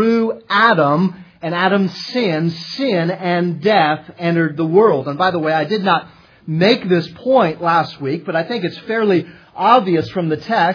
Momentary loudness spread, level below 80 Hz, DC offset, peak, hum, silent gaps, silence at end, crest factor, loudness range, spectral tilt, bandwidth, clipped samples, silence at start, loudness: 8 LU; -62 dBFS; under 0.1%; 0 dBFS; none; none; 0 s; 16 dB; 1 LU; -7 dB/octave; 5.4 kHz; under 0.1%; 0 s; -16 LUFS